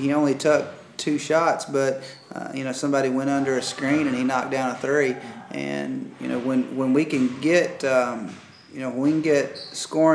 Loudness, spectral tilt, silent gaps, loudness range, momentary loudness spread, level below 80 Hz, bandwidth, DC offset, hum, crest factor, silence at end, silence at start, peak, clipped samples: -23 LUFS; -5 dB/octave; none; 2 LU; 12 LU; -76 dBFS; 11 kHz; under 0.1%; none; 18 dB; 0 s; 0 s; -6 dBFS; under 0.1%